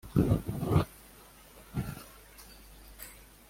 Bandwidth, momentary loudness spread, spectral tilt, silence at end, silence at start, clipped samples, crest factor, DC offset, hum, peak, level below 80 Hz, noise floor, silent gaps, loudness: 16.5 kHz; 24 LU; -7.5 dB/octave; 0.35 s; 0.05 s; under 0.1%; 22 dB; under 0.1%; none; -12 dBFS; -48 dBFS; -55 dBFS; none; -32 LUFS